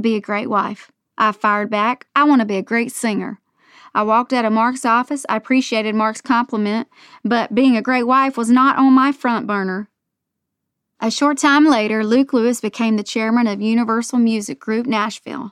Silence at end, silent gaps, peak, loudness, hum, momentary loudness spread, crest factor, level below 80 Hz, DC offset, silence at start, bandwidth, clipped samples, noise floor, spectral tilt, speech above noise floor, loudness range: 0 s; none; -4 dBFS; -17 LUFS; none; 10 LU; 14 dB; -66 dBFS; under 0.1%; 0 s; 13.5 kHz; under 0.1%; -78 dBFS; -4.5 dB/octave; 62 dB; 3 LU